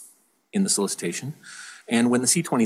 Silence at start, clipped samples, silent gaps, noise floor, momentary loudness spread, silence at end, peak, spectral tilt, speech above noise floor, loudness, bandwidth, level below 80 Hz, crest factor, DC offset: 0 s; under 0.1%; none; -55 dBFS; 20 LU; 0 s; -8 dBFS; -3.5 dB/octave; 32 dB; -23 LUFS; 15.5 kHz; -76 dBFS; 18 dB; under 0.1%